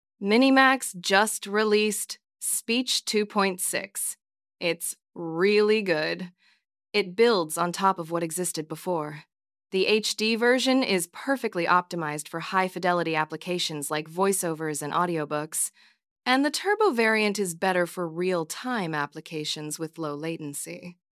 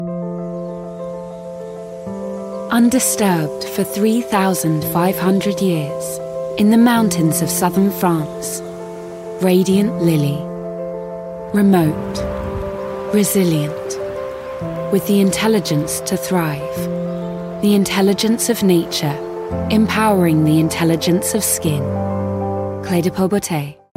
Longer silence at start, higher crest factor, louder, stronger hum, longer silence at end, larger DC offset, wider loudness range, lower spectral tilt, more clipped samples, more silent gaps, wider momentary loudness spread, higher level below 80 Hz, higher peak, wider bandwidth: first, 0.2 s vs 0 s; first, 22 dB vs 14 dB; second, -25 LUFS vs -17 LUFS; neither; about the same, 0.2 s vs 0.25 s; neither; about the same, 3 LU vs 3 LU; second, -3 dB/octave vs -5.5 dB/octave; neither; first, 16.11-16.16 s vs none; about the same, 11 LU vs 13 LU; second, -84 dBFS vs -44 dBFS; about the same, -4 dBFS vs -2 dBFS; about the same, 16 kHz vs 16.5 kHz